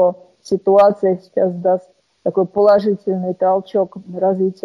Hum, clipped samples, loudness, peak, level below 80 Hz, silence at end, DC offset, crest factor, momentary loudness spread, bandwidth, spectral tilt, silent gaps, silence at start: none; under 0.1%; -17 LUFS; -2 dBFS; -62 dBFS; 0.1 s; under 0.1%; 14 dB; 10 LU; 7.4 kHz; -8 dB/octave; none; 0 s